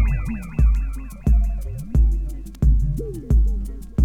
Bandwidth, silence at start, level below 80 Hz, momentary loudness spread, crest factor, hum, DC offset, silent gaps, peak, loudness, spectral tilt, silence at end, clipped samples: 2.8 kHz; 0 s; -20 dBFS; 9 LU; 12 dB; none; under 0.1%; none; -6 dBFS; -23 LUFS; -9 dB/octave; 0 s; under 0.1%